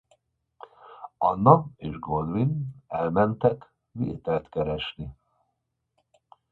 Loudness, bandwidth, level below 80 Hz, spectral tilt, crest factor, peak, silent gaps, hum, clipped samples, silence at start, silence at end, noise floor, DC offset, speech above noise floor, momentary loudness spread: -26 LUFS; 4.4 kHz; -52 dBFS; -10 dB/octave; 26 dB; -2 dBFS; none; none; under 0.1%; 0.85 s; 1.4 s; -79 dBFS; under 0.1%; 54 dB; 21 LU